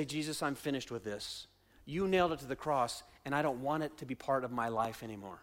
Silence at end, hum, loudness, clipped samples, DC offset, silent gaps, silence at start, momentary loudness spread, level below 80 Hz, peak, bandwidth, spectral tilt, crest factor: 0 s; none; -36 LUFS; under 0.1%; under 0.1%; none; 0 s; 11 LU; -64 dBFS; -20 dBFS; 16.5 kHz; -5 dB/octave; 18 dB